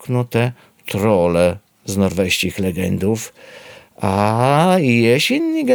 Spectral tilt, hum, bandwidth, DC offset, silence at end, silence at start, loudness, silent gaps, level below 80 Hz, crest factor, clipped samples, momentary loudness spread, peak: -5.5 dB/octave; none; over 20 kHz; under 0.1%; 0 s; 0 s; -17 LUFS; none; -48 dBFS; 16 dB; under 0.1%; 11 LU; 0 dBFS